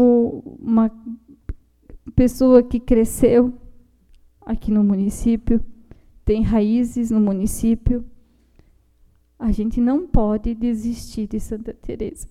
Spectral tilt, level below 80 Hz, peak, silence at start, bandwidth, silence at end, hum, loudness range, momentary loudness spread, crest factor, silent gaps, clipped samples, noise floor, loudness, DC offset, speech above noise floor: -7.5 dB/octave; -30 dBFS; -2 dBFS; 0 s; 14.5 kHz; 0.05 s; none; 5 LU; 15 LU; 18 dB; none; under 0.1%; -56 dBFS; -20 LUFS; under 0.1%; 37 dB